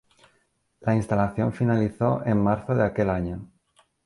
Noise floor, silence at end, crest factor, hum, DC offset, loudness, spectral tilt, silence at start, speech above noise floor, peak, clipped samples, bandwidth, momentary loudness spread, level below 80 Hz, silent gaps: -69 dBFS; 0.6 s; 16 dB; none; under 0.1%; -24 LUFS; -9 dB/octave; 0.8 s; 46 dB; -10 dBFS; under 0.1%; 11.5 kHz; 7 LU; -48 dBFS; none